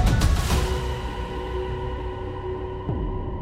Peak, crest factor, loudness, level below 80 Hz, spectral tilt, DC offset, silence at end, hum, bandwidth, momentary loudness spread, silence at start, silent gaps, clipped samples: -10 dBFS; 16 dB; -27 LUFS; -28 dBFS; -5.5 dB/octave; under 0.1%; 0 s; none; 16 kHz; 9 LU; 0 s; none; under 0.1%